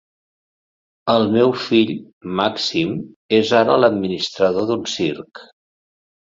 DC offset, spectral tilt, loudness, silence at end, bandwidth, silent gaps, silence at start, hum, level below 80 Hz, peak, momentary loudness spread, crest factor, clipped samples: under 0.1%; -5 dB/octave; -18 LUFS; 0.9 s; 7.8 kHz; 2.13-2.21 s, 3.16-3.29 s; 1.05 s; none; -58 dBFS; -2 dBFS; 12 LU; 18 dB; under 0.1%